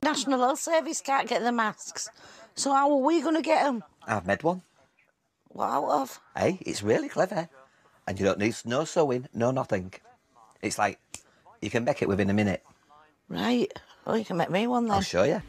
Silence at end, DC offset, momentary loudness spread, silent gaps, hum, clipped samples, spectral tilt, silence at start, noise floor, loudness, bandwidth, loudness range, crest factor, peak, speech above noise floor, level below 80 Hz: 0 s; under 0.1%; 12 LU; none; none; under 0.1%; -4.5 dB/octave; 0 s; -69 dBFS; -27 LUFS; 15 kHz; 4 LU; 20 dB; -8 dBFS; 42 dB; -62 dBFS